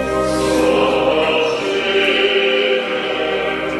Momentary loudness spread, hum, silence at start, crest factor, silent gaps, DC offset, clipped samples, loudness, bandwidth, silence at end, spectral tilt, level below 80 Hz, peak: 5 LU; none; 0 s; 14 dB; none; under 0.1%; under 0.1%; -16 LUFS; 13.5 kHz; 0 s; -4 dB/octave; -40 dBFS; -2 dBFS